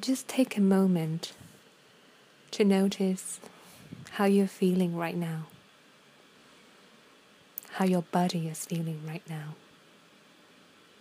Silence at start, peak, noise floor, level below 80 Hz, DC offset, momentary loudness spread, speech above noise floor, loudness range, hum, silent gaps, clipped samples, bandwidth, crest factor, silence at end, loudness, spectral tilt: 0 s; -12 dBFS; -59 dBFS; -78 dBFS; under 0.1%; 19 LU; 31 dB; 6 LU; none; none; under 0.1%; 15.5 kHz; 20 dB; 1.45 s; -29 LUFS; -6 dB/octave